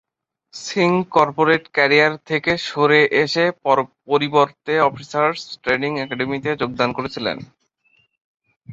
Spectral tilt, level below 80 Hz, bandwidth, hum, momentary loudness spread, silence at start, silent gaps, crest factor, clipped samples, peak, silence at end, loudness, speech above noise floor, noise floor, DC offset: -5 dB/octave; -58 dBFS; 7.8 kHz; none; 10 LU; 0.55 s; 8.24-8.38 s, 8.56-8.61 s; 18 dB; under 0.1%; -2 dBFS; 0 s; -18 LUFS; 44 dB; -62 dBFS; under 0.1%